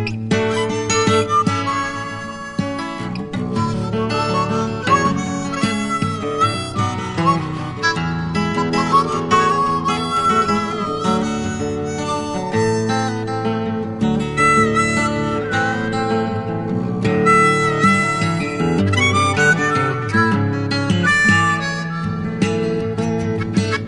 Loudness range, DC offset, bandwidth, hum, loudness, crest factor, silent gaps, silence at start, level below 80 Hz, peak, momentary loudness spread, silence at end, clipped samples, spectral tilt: 5 LU; under 0.1%; 11 kHz; none; -18 LUFS; 16 dB; none; 0 s; -44 dBFS; -2 dBFS; 8 LU; 0 s; under 0.1%; -5 dB/octave